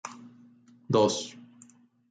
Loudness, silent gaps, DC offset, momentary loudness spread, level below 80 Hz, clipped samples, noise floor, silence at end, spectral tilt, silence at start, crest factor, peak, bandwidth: -27 LUFS; none; under 0.1%; 25 LU; -76 dBFS; under 0.1%; -58 dBFS; 0.7 s; -5 dB/octave; 0.05 s; 22 dB; -10 dBFS; 9.6 kHz